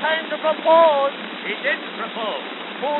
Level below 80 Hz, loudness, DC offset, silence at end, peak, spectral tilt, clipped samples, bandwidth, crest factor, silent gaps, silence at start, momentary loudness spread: under -90 dBFS; -20 LUFS; under 0.1%; 0 s; -4 dBFS; 0 dB/octave; under 0.1%; 4.2 kHz; 18 dB; none; 0 s; 14 LU